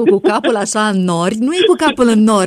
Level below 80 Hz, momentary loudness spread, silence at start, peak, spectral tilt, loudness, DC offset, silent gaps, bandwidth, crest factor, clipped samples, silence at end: -52 dBFS; 4 LU; 0 s; 0 dBFS; -5 dB/octave; -13 LUFS; under 0.1%; none; 13 kHz; 12 dB; under 0.1%; 0 s